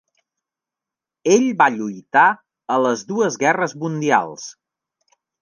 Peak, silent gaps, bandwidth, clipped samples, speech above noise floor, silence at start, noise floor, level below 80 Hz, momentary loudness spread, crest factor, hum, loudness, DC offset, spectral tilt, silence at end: -2 dBFS; none; 10 kHz; under 0.1%; 70 dB; 1.25 s; -88 dBFS; -74 dBFS; 14 LU; 18 dB; none; -18 LUFS; under 0.1%; -4.5 dB/octave; 0.9 s